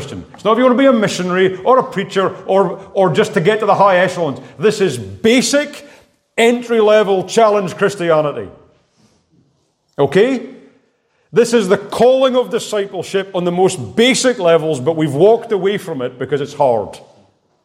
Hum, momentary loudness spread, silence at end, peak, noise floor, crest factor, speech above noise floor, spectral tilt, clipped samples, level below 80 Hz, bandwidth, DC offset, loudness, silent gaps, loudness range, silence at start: none; 9 LU; 0.65 s; 0 dBFS; -61 dBFS; 14 dB; 47 dB; -4.5 dB/octave; under 0.1%; -60 dBFS; 15.5 kHz; under 0.1%; -14 LUFS; none; 4 LU; 0 s